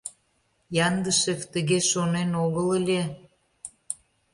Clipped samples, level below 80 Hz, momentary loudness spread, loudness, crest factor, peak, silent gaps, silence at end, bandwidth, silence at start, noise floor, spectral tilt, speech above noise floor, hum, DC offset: under 0.1%; -62 dBFS; 19 LU; -25 LUFS; 16 dB; -10 dBFS; none; 0.4 s; 11.5 kHz; 0.05 s; -69 dBFS; -4 dB/octave; 45 dB; none; under 0.1%